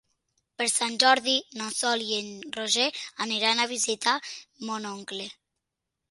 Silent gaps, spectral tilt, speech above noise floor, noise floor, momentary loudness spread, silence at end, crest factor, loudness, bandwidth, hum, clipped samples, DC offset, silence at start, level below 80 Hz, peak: none; -0.5 dB/octave; 57 dB; -85 dBFS; 15 LU; 0.8 s; 26 dB; -26 LUFS; 12 kHz; none; under 0.1%; under 0.1%; 0.6 s; -78 dBFS; -2 dBFS